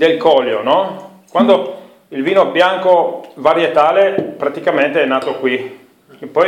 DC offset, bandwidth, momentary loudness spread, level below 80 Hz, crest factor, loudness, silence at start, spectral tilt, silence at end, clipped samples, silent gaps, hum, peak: under 0.1%; 10.5 kHz; 13 LU; -62 dBFS; 14 dB; -14 LUFS; 0 s; -5.5 dB/octave; 0 s; under 0.1%; none; none; 0 dBFS